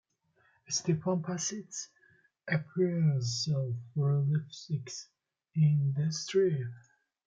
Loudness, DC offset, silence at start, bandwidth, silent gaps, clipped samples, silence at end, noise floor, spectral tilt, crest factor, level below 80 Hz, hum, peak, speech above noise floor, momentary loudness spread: -32 LUFS; under 0.1%; 0.7 s; 7.8 kHz; none; under 0.1%; 0.45 s; -71 dBFS; -5.5 dB/octave; 16 dB; -74 dBFS; none; -16 dBFS; 40 dB; 13 LU